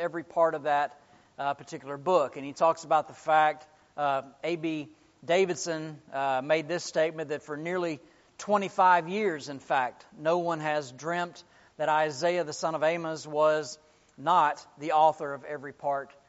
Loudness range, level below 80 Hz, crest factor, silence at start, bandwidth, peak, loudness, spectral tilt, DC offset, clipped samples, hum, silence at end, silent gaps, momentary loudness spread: 2 LU; -76 dBFS; 18 dB; 0 s; 8 kHz; -10 dBFS; -29 LUFS; -3 dB/octave; under 0.1%; under 0.1%; none; 0.2 s; none; 13 LU